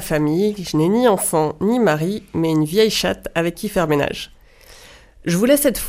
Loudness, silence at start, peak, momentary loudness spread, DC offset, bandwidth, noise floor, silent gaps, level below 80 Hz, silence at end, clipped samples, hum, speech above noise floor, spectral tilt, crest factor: -18 LUFS; 0 s; -2 dBFS; 7 LU; under 0.1%; 15.5 kHz; -45 dBFS; none; -44 dBFS; 0 s; under 0.1%; none; 27 dB; -5 dB/octave; 16 dB